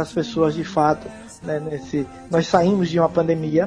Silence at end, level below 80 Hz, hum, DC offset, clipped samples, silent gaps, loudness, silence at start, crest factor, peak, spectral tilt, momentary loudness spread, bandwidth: 0 s; -50 dBFS; none; under 0.1%; under 0.1%; none; -21 LUFS; 0 s; 18 dB; -2 dBFS; -7 dB/octave; 10 LU; 10.5 kHz